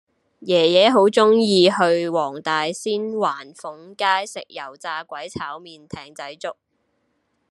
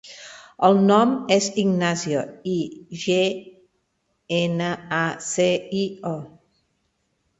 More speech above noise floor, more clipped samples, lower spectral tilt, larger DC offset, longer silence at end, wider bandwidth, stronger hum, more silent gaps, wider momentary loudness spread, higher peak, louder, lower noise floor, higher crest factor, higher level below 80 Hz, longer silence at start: about the same, 49 dB vs 50 dB; neither; about the same, -4.5 dB/octave vs -5 dB/octave; neither; about the same, 1 s vs 1.1 s; first, 12 kHz vs 8.2 kHz; neither; neither; first, 21 LU vs 14 LU; about the same, -2 dBFS vs -2 dBFS; first, -19 LUFS vs -22 LUFS; about the same, -69 dBFS vs -72 dBFS; about the same, 20 dB vs 20 dB; about the same, -68 dBFS vs -64 dBFS; first, 0.4 s vs 0.05 s